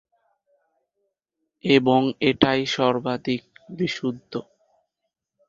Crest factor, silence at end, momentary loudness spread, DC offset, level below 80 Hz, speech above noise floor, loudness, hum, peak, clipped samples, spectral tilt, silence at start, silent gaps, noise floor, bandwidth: 22 dB; 1.05 s; 15 LU; under 0.1%; -58 dBFS; 59 dB; -22 LUFS; none; -2 dBFS; under 0.1%; -5.5 dB/octave; 1.65 s; none; -81 dBFS; 7.6 kHz